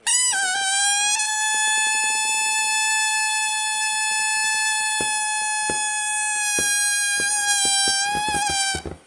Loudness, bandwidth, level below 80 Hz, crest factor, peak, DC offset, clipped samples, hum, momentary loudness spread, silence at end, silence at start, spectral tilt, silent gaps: -19 LUFS; 11.5 kHz; -54 dBFS; 16 dB; -6 dBFS; under 0.1%; under 0.1%; none; 4 LU; 0.1 s; 0.05 s; 1.5 dB/octave; none